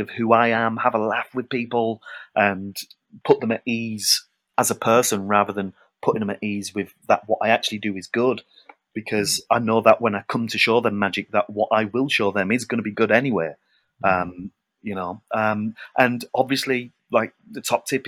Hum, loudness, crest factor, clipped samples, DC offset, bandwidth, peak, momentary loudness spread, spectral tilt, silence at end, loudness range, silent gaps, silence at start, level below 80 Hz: none; -22 LUFS; 22 dB; under 0.1%; under 0.1%; 17.5 kHz; 0 dBFS; 13 LU; -4 dB/octave; 0 s; 4 LU; none; 0 s; -66 dBFS